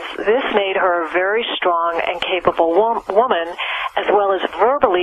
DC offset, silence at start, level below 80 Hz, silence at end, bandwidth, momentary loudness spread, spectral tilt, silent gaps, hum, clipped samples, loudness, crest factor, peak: under 0.1%; 0 s; -52 dBFS; 0 s; 9.8 kHz; 4 LU; -5 dB/octave; none; none; under 0.1%; -17 LUFS; 16 dB; -2 dBFS